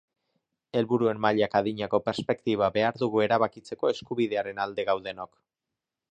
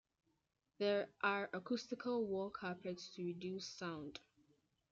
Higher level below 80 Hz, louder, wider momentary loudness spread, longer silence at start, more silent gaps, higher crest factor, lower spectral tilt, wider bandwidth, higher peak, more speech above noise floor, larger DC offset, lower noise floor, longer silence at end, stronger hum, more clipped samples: first, -64 dBFS vs -82 dBFS; first, -27 LUFS vs -43 LUFS; second, 6 LU vs 9 LU; about the same, 0.75 s vs 0.8 s; neither; about the same, 20 dB vs 20 dB; first, -6.5 dB/octave vs -5 dB/octave; first, 9.6 kHz vs 7.8 kHz; first, -8 dBFS vs -24 dBFS; first, 61 dB vs 35 dB; neither; first, -88 dBFS vs -78 dBFS; first, 0.85 s vs 0.7 s; neither; neither